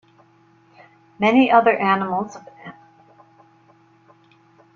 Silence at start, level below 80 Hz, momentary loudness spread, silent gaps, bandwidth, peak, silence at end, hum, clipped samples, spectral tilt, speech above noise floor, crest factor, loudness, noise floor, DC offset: 1.2 s; -66 dBFS; 27 LU; none; 7.2 kHz; -2 dBFS; 2.05 s; none; under 0.1%; -6.5 dB/octave; 38 dB; 20 dB; -17 LUFS; -55 dBFS; under 0.1%